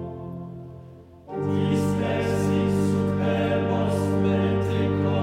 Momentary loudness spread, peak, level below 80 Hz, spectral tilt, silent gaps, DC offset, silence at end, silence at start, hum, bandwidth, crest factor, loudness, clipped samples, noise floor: 14 LU; -10 dBFS; -50 dBFS; -7.5 dB/octave; none; under 0.1%; 0 s; 0 s; none; 14 kHz; 14 dB; -24 LUFS; under 0.1%; -45 dBFS